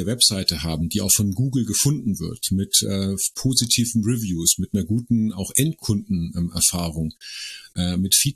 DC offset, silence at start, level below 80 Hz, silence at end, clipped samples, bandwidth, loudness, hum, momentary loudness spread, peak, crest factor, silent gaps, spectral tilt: under 0.1%; 0 s; -44 dBFS; 0.05 s; under 0.1%; 14 kHz; -21 LUFS; none; 9 LU; -2 dBFS; 20 dB; none; -3.5 dB/octave